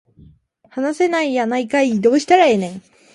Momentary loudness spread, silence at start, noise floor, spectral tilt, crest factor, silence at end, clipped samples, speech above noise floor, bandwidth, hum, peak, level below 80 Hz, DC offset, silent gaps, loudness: 14 LU; 0.75 s; -50 dBFS; -5 dB/octave; 16 dB; 0.35 s; under 0.1%; 34 dB; 11.5 kHz; none; -2 dBFS; -60 dBFS; under 0.1%; none; -16 LUFS